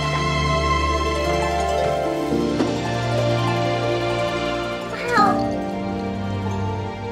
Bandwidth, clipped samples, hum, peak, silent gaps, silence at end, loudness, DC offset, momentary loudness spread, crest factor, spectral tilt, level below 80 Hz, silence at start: 15 kHz; under 0.1%; none; -4 dBFS; none; 0 s; -22 LUFS; under 0.1%; 7 LU; 18 dB; -5.5 dB/octave; -36 dBFS; 0 s